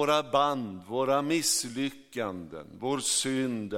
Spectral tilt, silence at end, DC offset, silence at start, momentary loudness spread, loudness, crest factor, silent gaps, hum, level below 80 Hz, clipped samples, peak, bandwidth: -3 dB/octave; 0 s; under 0.1%; 0 s; 10 LU; -29 LUFS; 18 dB; none; none; -68 dBFS; under 0.1%; -12 dBFS; 17 kHz